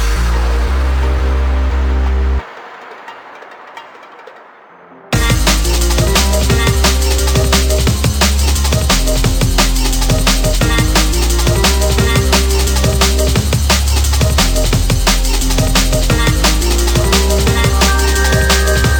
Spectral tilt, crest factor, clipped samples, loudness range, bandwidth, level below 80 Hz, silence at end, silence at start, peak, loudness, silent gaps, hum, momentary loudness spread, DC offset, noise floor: -4 dB/octave; 10 dB; under 0.1%; 7 LU; 19.5 kHz; -14 dBFS; 0 s; 0 s; -2 dBFS; -13 LUFS; none; none; 5 LU; under 0.1%; -39 dBFS